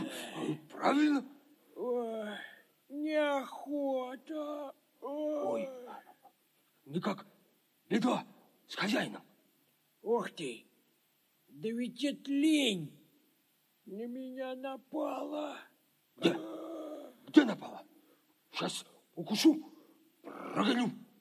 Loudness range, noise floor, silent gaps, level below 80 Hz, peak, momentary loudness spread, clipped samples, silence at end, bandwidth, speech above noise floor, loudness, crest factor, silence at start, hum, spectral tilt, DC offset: 6 LU; -73 dBFS; none; under -90 dBFS; -8 dBFS; 20 LU; under 0.1%; 0.15 s; 15 kHz; 40 dB; -35 LUFS; 28 dB; 0 s; none; -4.5 dB/octave; under 0.1%